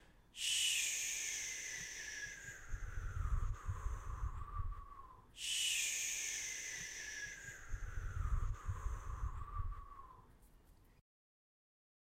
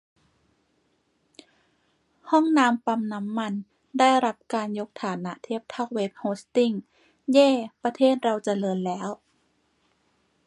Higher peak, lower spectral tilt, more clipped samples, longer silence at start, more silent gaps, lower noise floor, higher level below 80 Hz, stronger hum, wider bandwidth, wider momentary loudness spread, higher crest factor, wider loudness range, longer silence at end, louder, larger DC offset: second, -24 dBFS vs -6 dBFS; second, -0.5 dB/octave vs -5.5 dB/octave; neither; second, 0 s vs 2.25 s; neither; second, -65 dBFS vs -70 dBFS; first, -46 dBFS vs -78 dBFS; neither; first, 16 kHz vs 11.5 kHz; about the same, 15 LU vs 14 LU; about the same, 18 dB vs 20 dB; first, 8 LU vs 3 LU; second, 1.15 s vs 1.3 s; second, -41 LUFS vs -25 LUFS; neither